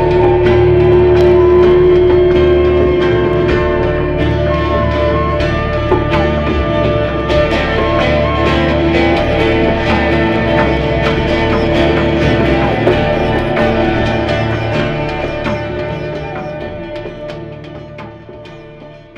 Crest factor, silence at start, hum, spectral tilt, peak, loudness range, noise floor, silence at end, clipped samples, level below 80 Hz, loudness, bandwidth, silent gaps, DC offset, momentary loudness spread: 12 dB; 0 s; none; -7.5 dB/octave; 0 dBFS; 10 LU; -34 dBFS; 0 s; under 0.1%; -22 dBFS; -12 LUFS; 7.4 kHz; none; under 0.1%; 15 LU